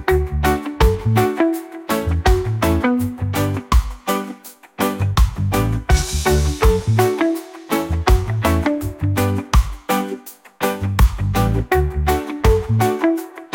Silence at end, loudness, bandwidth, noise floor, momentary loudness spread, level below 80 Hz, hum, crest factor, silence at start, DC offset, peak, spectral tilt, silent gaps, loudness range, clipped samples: 0.1 s; -19 LUFS; 17 kHz; -37 dBFS; 6 LU; -22 dBFS; none; 16 dB; 0 s; under 0.1%; -2 dBFS; -6 dB/octave; none; 2 LU; under 0.1%